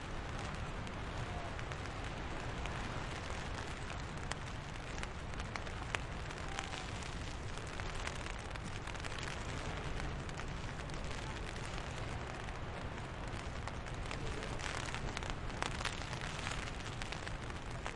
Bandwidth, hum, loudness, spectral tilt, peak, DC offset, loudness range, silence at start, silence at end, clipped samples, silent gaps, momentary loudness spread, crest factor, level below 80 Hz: 11.5 kHz; none; -43 LUFS; -4.5 dB/octave; -14 dBFS; under 0.1%; 2 LU; 0 s; 0 s; under 0.1%; none; 3 LU; 28 dB; -48 dBFS